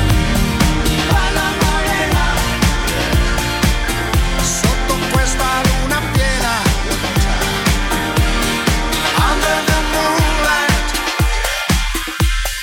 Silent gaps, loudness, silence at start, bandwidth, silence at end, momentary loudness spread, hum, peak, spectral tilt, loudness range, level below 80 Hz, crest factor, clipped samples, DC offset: none; -16 LUFS; 0 s; 17.5 kHz; 0 s; 3 LU; none; -2 dBFS; -4 dB/octave; 1 LU; -20 dBFS; 14 dB; under 0.1%; under 0.1%